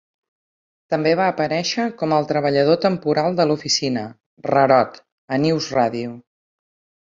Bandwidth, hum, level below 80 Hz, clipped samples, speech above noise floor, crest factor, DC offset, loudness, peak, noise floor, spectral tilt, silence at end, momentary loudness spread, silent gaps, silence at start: 7.8 kHz; none; -62 dBFS; under 0.1%; over 71 dB; 18 dB; under 0.1%; -19 LUFS; -2 dBFS; under -90 dBFS; -5 dB/octave; 1 s; 10 LU; 4.26-4.37 s, 5.12-5.28 s; 0.9 s